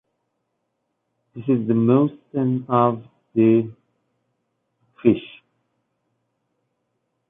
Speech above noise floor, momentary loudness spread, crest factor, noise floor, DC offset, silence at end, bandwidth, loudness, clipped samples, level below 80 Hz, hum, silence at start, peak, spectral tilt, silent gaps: 57 dB; 10 LU; 20 dB; -75 dBFS; under 0.1%; 2 s; 3.8 kHz; -20 LUFS; under 0.1%; -64 dBFS; none; 1.35 s; -4 dBFS; -12 dB/octave; none